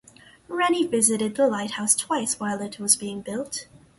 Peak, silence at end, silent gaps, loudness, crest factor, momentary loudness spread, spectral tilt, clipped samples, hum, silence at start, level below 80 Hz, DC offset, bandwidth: -4 dBFS; 0.35 s; none; -23 LUFS; 22 dB; 11 LU; -2.5 dB/octave; under 0.1%; none; 0.5 s; -66 dBFS; under 0.1%; 12 kHz